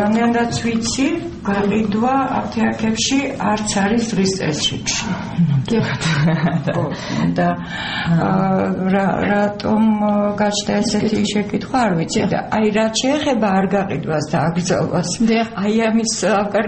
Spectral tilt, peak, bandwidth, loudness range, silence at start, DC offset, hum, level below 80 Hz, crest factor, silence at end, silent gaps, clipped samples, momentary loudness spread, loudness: -5 dB/octave; -4 dBFS; 8.8 kHz; 1 LU; 0 s; under 0.1%; none; -44 dBFS; 12 dB; 0 s; none; under 0.1%; 4 LU; -18 LUFS